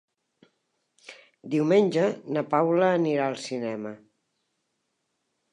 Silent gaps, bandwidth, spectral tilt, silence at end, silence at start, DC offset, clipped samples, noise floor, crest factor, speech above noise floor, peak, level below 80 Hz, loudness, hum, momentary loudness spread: none; 11 kHz; -6.5 dB/octave; 1.55 s; 1.1 s; under 0.1%; under 0.1%; -78 dBFS; 20 dB; 53 dB; -8 dBFS; -82 dBFS; -25 LUFS; none; 13 LU